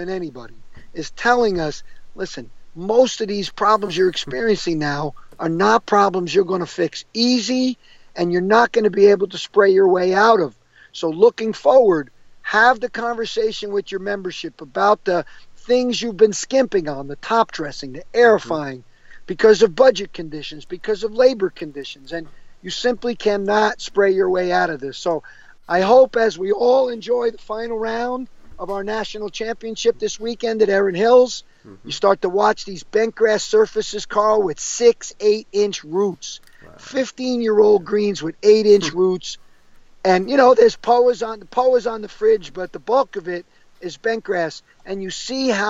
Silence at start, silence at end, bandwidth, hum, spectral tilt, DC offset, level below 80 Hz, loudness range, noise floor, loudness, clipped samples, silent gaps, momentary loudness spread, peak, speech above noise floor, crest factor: 0 s; 0 s; 8 kHz; none; -4 dB/octave; under 0.1%; -50 dBFS; 5 LU; -46 dBFS; -18 LUFS; under 0.1%; none; 16 LU; -2 dBFS; 28 dB; 16 dB